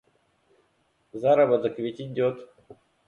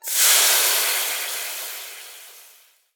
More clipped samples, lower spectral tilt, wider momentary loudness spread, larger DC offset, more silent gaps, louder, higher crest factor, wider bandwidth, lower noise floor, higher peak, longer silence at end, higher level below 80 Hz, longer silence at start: neither; first, -8 dB/octave vs 7.5 dB/octave; second, 17 LU vs 22 LU; neither; neither; second, -24 LUFS vs -17 LUFS; about the same, 18 dB vs 20 dB; second, 6.8 kHz vs over 20 kHz; first, -69 dBFS vs -53 dBFS; second, -10 dBFS vs -2 dBFS; second, 0.35 s vs 0.55 s; first, -70 dBFS vs under -90 dBFS; first, 1.15 s vs 0.05 s